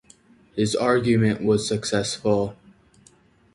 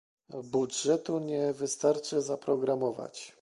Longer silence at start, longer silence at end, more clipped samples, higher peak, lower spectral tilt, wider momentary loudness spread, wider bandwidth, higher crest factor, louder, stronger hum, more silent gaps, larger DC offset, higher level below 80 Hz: first, 0.55 s vs 0.3 s; first, 1 s vs 0.1 s; neither; first, -6 dBFS vs -14 dBFS; about the same, -5.5 dB/octave vs -4.5 dB/octave; second, 6 LU vs 12 LU; about the same, 11.5 kHz vs 11.5 kHz; about the same, 18 dB vs 18 dB; first, -22 LUFS vs -31 LUFS; neither; neither; neither; first, -52 dBFS vs -76 dBFS